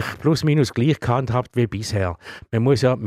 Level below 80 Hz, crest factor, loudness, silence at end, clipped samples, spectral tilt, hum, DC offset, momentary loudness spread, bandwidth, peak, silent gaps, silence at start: -46 dBFS; 14 dB; -21 LUFS; 0 s; under 0.1%; -6.5 dB/octave; none; under 0.1%; 7 LU; 15 kHz; -6 dBFS; none; 0 s